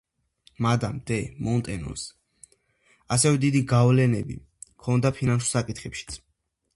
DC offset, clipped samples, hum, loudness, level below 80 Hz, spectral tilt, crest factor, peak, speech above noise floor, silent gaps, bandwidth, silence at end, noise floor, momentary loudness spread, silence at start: under 0.1%; under 0.1%; none; -24 LUFS; -50 dBFS; -5.5 dB/octave; 18 dB; -8 dBFS; 51 dB; none; 11.5 kHz; 0.6 s; -75 dBFS; 16 LU; 0.6 s